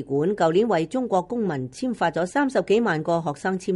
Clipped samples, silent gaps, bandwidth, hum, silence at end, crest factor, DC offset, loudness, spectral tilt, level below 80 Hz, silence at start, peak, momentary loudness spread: under 0.1%; none; 11.5 kHz; none; 0 s; 14 dB; under 0.1%; -23 LUFS; -6.5 dB/octave; -60 dBFS; 0 s; -10 dBFS; 6 LU